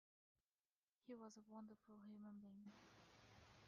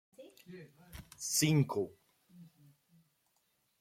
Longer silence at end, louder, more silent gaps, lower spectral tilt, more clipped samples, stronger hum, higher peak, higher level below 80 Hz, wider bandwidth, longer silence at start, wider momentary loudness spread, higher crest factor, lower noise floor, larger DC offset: second, 0 s vs 1.35 s; second, -63 LUFS vs -33 LUFS; neither; about the same, -5.5 dB/octave vs -4.5 dB/octave; neither; neither; second, -48 dBFS vs -18 dBFS; second, -88 dBFS vs -68 dBFS; second, 7 kHz vs 16.5 kHz; first, 1.05 s vs 0.2 s; second, 8 LU vs 25 LU; about the same, 16 dB vs 20 dB; first, under -90 dBFS vs -78 dBFS; neither